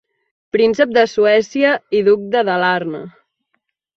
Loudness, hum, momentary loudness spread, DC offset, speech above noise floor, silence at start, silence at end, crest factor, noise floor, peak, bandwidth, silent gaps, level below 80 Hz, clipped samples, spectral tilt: -15 LUFS; none; 8 LU; under 0.1%; 55 dB; 0.55 s; 0.9 s; 14 dB; -70 dBFS; -2 dBFS; 7.2 kHz; none; -60 dBFS; under 0.1%; -5 dB/octave